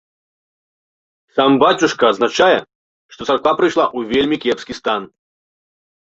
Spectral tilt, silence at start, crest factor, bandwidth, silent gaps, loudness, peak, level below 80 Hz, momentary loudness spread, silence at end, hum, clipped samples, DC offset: -4 dB/octave; 1.35 s; 18 dB; 8 kHz; 2.75-3.09 s; -16 LUFS; 0 dBFS; -56 dBFS; 9 LU; 1.1 s; none; under 0.1%; under 0.1%